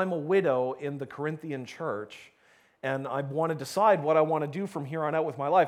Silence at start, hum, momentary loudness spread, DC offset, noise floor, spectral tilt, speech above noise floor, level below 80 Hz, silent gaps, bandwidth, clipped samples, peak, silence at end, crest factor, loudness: 0 s; none; 13 LU; under 0.1%; -55 dBFS; -6.5 dB/octave; 27 dB; -78 dBFS; none; 15.5 kHz; under 0.1%; -10 dBFS; 0 s; 18 dB; -29 LUFS